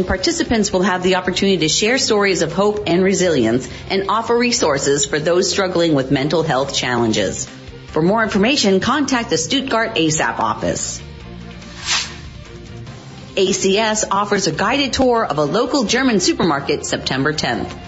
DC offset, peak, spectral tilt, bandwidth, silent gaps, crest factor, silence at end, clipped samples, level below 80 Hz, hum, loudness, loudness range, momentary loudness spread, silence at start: under 0.1%; -4 dBFS; -3.5 dB/octave; 8 kHz; none; 14 dB; 0 s; under 0.1%; -42 dBFS; none; -17 LUFS; 4 LU; 13 LU; 0 s